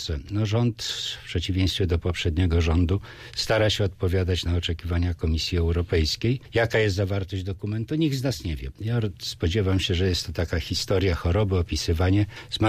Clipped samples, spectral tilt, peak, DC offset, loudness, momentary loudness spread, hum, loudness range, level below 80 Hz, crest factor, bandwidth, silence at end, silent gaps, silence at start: under 0.1%; -5.5 dB/octave; -10 dBFS; under 0.1%; -25 LUFS; 7 LU; none; 2 LU; -36 dBFS; 14 dB; 15 kHz; 0 s; none; 0 s